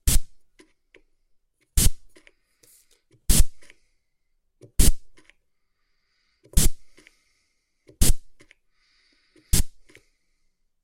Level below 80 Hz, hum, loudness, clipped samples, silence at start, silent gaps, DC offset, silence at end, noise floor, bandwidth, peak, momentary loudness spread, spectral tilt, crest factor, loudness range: -28 dBFS; none; -25 LUFS; under 0.1%; 0.05 s; none; under 0.1%; 1.15 s; -71 dBFS; 16.5 kHz; -2 dBFS; 13 LU; -3 dB/octave; 22 dB; 2 LU